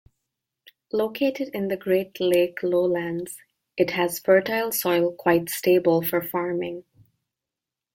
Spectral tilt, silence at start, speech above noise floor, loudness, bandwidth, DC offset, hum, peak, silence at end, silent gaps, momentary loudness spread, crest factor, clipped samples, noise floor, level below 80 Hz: -5 dB/octave; 0.95 s; 65 dB; -23 LUFS; 16.5 kHz; under 0.1%; none; -6 dBFS; 1.15 s; none; 10 LU; 18 dB; under 0.1%; -88 dBFS; -66 dBFS